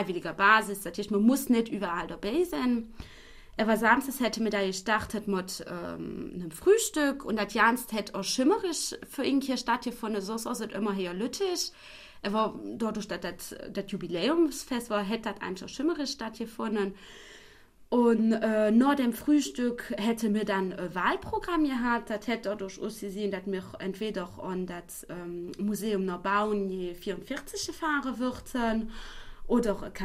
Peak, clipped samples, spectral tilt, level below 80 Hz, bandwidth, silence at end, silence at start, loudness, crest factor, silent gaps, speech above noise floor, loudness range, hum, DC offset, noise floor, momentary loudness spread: -8 dBFS; under 0.1%; -4 dB/octave; -52 dBFS; 15.5 kHz; 0 s; 0 s; -29 LUFS; 22 dB; none; 25 dB; 6 LU; none; under 0.1%; -54 dBFS; 13 LU